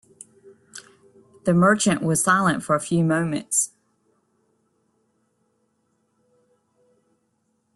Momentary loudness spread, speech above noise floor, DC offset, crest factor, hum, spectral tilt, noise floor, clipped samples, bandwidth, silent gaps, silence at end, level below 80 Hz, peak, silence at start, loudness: 25 LU; 50 dB; under 0.1%; 20 dB; none; -4.5 dB/octave; -70 dBFS; under 0.1%; 12.5 kHz; none; 4.1 s; -62 dBFS; -6 dBFS; 0.75 s; -21 LUFS